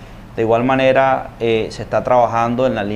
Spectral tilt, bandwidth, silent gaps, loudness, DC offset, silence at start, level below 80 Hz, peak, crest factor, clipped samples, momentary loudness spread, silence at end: -6.5 dB/octave; 10.5 kHz; none; -16 LUFS; under 0.1%; 0 s; -40 dBFS; -2 dBFS; 14 dB; under 0.1%; 8 LU; 0 s